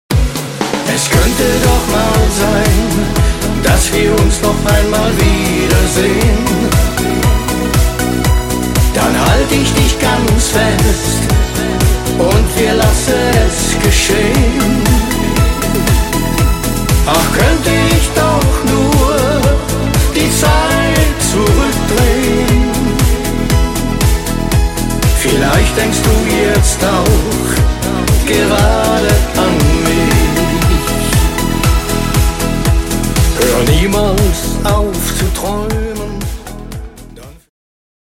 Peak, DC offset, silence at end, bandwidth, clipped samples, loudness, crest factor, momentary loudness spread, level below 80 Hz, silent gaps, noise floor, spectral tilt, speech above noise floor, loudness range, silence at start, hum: 0 dBFS; under 0.1%; 0.85 s; 17 kHz; under 0.1%; -12 LUFS; 12 dB; 4 LU; -16 dBFS; none; -33 dBFS; -4.5 dB/octave; 23 dB; 2 LU; 0.1 s; none